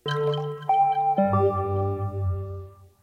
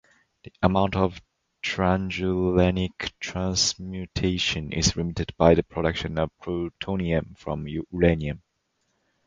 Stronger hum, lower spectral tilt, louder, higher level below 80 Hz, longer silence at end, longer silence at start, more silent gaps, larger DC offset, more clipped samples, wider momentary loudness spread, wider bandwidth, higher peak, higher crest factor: neither; first, -8 dB/octave vs -5 dB/octave; about the same, -25 LUFS vs -25 LUFS; second, -52 dBFS vs -40 dBFS; second, 0.15 s vs 0.9 s; second, 0.05 s vs 0.6 s; neither; neither; neither; about the same, 10 LU vs 10 LU; second, 6.6 kHz vs 9.4 kHz; second, -10 dBFS vs -2 dBFS; second, 16 dB vs 22 dB